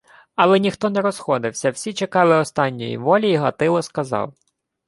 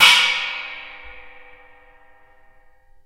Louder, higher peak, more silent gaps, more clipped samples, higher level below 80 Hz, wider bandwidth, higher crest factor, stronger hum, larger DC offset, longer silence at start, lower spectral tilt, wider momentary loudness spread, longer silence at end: about the same, -19 LUFS vs -17 LUFS; about the same, -2 dBFS vs 0 dBFS; neither; neither; second, -62 dBFS vs -54 dBFS; second, 11.5 kHz vs 16 kHz; about the same, 18 dB vs 22 dB; neither; neither; first, 0.4 s vs 0 s; first, -5.5 dB/octave vs 2 dB/octave; second, 9 LU vs 28 LU; second, 0.55 s vs 1.65 s